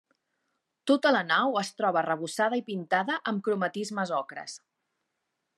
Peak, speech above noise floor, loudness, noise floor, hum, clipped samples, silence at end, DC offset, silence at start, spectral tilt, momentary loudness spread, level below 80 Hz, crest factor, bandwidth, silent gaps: -10 dBFS; 54 dB; -28 LUFS; -82 dBFS; none; under 0.1%; 1 s; under 0.1%; 0.85 s; -4.5 dB/octave; 14 LU; -88 dBFS; 20 dB; 13 kHz; none